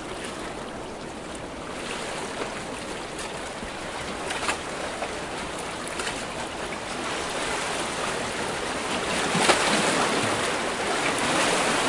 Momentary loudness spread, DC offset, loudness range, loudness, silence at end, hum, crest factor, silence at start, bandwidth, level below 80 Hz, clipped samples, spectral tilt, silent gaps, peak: 12 LU; under 0.1%; 9 LU; -27 LUFS; 0 s; none; 24 dB; 0 s; 11.5 kHz; -50 dBFS; under 0.1%; -2.5 dB/octave; none; -4 dBFS